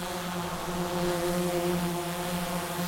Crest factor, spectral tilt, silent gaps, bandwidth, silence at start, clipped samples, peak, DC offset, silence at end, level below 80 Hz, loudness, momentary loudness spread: 14 dB; -4.5 dB/octave; none; 16.5 kHz; 0 s; under 0.1%; -16 dBFS; under 0.1%; 0 s; -48 dBFS; -30 LUFS; 5 LU